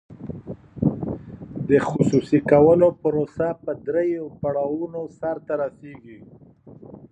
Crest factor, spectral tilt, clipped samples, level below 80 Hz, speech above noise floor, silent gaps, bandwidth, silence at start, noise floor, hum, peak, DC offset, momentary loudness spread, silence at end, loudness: 20 dB; -8.5 dB/octave; under 0.1%; -50 dBFS; 25 dB; none; 9 kHz; 0.1 s; -46 dBFS; none; -2 dBFS; under 0.1%; 21 LU; 0.05 s; -22 LUFS